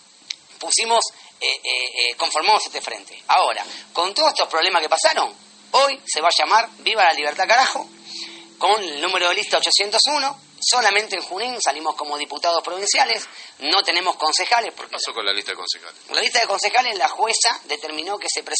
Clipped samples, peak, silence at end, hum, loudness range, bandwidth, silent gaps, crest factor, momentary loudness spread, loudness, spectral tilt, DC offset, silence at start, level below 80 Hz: under 0.1%; -2 dBFS; 0 s; none; 2 LU; 8.8 kHz; none; 18 dB; 11 LU; -19 LUFS; 1.5 dB/octave; under 0.1%; 0.3 s; -82 dBFS